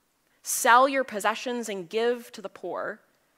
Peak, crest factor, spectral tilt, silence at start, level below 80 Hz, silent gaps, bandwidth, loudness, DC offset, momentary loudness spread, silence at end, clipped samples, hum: -4 dBFS; 22 dB; -1.5 dB/octave; 0.45 s; -84 dBFS; none; 16 kHz; -25 LUFS; under 0.1%; 19 LU; 0.4 s; under 0.1%; none